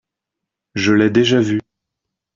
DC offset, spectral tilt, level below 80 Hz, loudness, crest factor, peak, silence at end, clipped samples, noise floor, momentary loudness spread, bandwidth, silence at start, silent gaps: under 0.1%; -5.5 dB/octave; -56 dBFS; -15 LUFS; 16 dB; -2 dBFS; 0.75 s; under 0.1%; -82 dBFS; 10 LU; 7.6 kHz; 0.75 s; none